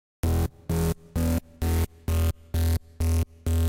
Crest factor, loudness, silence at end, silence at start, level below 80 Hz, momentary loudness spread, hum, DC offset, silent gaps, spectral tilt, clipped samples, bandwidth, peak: 12 dB; -28 LUFS; 0 s; 0.25 s; -30 dBFS; 2 LU; none; under 0.1%; none; -6.5 dB/octave; under 0.1%; 16.5 kHz; -14 dBFS